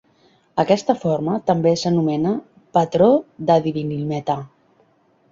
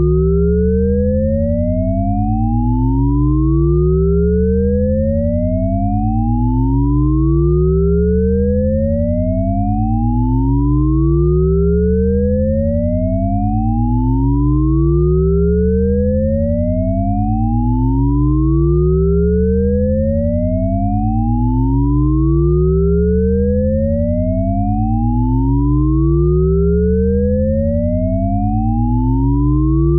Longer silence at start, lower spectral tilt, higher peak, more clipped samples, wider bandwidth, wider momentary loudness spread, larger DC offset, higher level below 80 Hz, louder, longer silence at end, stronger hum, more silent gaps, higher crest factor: first, 0.55 s vs 0 s; second, -7 dB/octave vs -14.5 dB/octave; about the same, -2 dBFS vs -4 dBFS; neither; first, 7.6 kHz vs 2.3 kHz; first, 9 LU vs 3 LU; neither; second, -58 dBFS vs -20 dBFS; second, -20 LUFS vs -15 LUFS; first, 0.85 s vs 0 s; neither; neither; first, 18 dB vs 10 dB